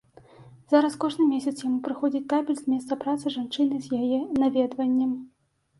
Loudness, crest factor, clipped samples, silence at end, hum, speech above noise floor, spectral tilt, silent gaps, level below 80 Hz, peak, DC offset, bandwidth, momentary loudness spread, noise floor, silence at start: -26 LUFS; 18 dB; under 0.1%; 0.5 s; none; 26 dB; -5.5 dB/octave; none; -66 dBFS; -6 dBFS; under 0.1%; 11.5 kHz; 6 LU; -51 dBFS; 0.4 s